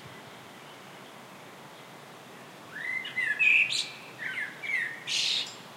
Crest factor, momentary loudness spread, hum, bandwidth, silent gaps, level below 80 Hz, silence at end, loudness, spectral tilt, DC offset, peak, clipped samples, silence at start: 20 dB; 25 LU; none; 16 kHz; none; -84 dBFS; 0 s; -27 LUFS; 0 dB/octave; under 0.1%; -12 dBFS; under 0.1%; 0 s